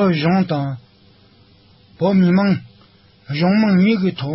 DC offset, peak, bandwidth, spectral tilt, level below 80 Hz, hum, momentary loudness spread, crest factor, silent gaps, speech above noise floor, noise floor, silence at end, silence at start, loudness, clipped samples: under 0.1%; -6 dBFS; 5.8 kHz; -11.5 dB/octave; -54 dBFS; none; 11 LU; 12 dB; none; 35 dB; -51 dBFS; 0 s; 0 s; -17 LUFS; under 0.1%